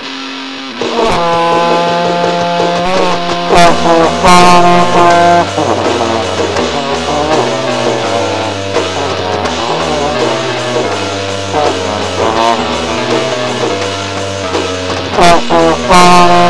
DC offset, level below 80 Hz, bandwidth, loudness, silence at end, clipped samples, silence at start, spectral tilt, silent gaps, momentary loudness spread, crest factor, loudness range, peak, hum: under 0.1%; -34 dBFS; 11 kHz; -10 LUFS; 0 s; 0.5%; 0 s; -4 dB/octave; none; 9 LU; 10 dB; 6 LU; 0 dBFS; none